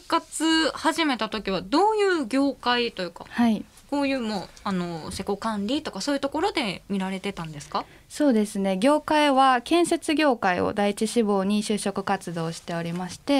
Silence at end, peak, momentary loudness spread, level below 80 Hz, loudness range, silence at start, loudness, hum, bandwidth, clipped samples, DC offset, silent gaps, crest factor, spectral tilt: 0 s; -8 dBFS; 11 LU; -56 dBFS; 6 LU; 0.1 s; -25 LUFS; none; 15.5 kHz; under 0.1%; under 0.1%; none; 18 dB; -4.5 dB/octave